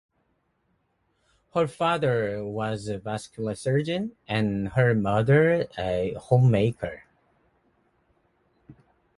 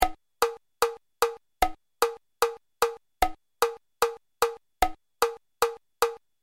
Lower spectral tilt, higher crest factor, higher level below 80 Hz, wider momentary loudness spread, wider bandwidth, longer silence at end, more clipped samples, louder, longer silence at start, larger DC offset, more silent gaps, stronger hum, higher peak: first, -7.5 dB/octave vs -2 dB/octave; about the same, 20 dB vs 24 dB; second, -54 dBFS vs -46 dBFS; first, 12 LU vs 0 LU; second, 11.5 kHz vs 16.5 kHz; first, 0.45 s vs 0.25 s; neither; first, -25 LUFS vs -29 LUFS; first, 1.55 s vs 0 s; neither; neither; neither; second, -8 dBFS vs -4 dBFS